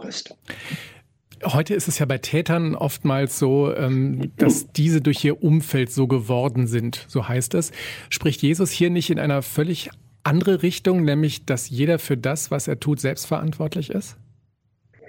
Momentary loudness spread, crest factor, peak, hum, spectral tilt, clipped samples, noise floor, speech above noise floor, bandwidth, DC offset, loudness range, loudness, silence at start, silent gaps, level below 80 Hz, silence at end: 10 LU; 18 dB; -4 dBFS; none; -5.5 dB/octave; under 0.1%; -64 dBFS; 43 dB; 17 kHz; under 0.1%; 3 LU; -22 LUFS; 0 s; none; -58 dBFS; 0.85 s